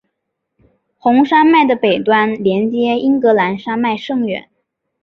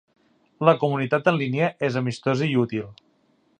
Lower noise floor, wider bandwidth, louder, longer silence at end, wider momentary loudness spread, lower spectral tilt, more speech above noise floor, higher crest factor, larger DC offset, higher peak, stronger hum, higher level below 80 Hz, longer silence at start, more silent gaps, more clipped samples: first, -74 dBFS vs -64 dBFS; second, 6.4 kHz vs 9.6 kHz; first, -14 LUFS vs -23 LUFS; about the same, 0.65 s vs 0.65 s; about the same, 9 LU vs 7 LU; about the same, -7.5 dB/octave vs -7 dB/octave; first, 61 dB vs 42 dB; second, 14 dB vs 22 dB; neither; about the same, -2 dBFS vs -2 dBFS; neither; first, -60 dBFS vs -66 dBFS; first, 1.05 s vs 0.6 s; neither; neither